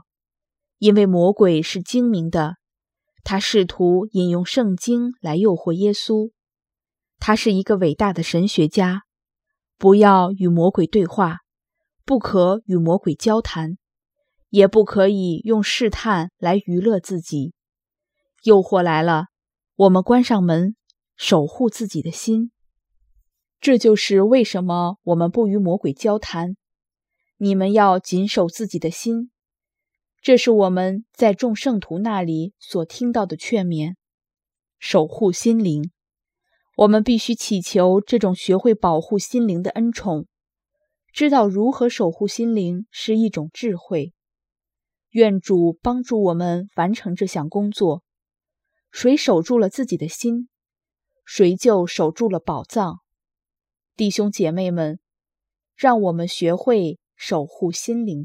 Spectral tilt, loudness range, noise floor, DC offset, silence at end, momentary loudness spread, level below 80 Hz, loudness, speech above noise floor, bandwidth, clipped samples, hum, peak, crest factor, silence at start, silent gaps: -6 dB/octave; 5 LU; -90 dBFS; under 0.1%; 0 s; 11 LU; -52 dBFS; -19 LUFS; 72 dB; 15 kHz; under 0.1%; none; 0 dBFS; 20 dB; 0.8 s; 34.14-34.18 s